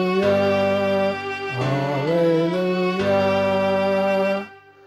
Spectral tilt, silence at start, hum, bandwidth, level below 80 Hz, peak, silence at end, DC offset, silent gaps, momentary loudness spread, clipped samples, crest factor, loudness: -7 dB/octave; 0 s; none; 12.5 kHz; -60 dBFS; -8 dBFS; 0.3 s; under 0.1%; none; 6 LU; under 0.1%; 12 dB; -20 LUFS